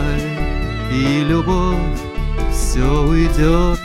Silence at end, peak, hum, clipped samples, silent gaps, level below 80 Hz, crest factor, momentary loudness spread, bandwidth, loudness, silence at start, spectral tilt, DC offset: 0 s; -2 dBFS; none; under 0.1%; none; -18 dBFS; 14 dB; 7 LU; 14 kHz; -18 LUFS; 0 s; -6 dB/octave; 0.3%